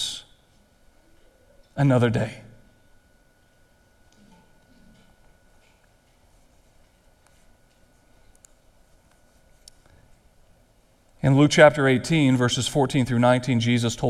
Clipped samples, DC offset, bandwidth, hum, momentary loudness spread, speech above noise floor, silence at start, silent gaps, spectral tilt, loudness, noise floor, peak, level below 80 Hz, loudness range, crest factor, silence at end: under 0.1%; under 0.1%; 13.5 kHz; none; 15 LU; 40 dB; 0 s; none; -5.5 dB/octave; -20 LUFS; -59 dBFS; 0 dBFS; -54 dBFS; 10 LU; 24 dB; 0 s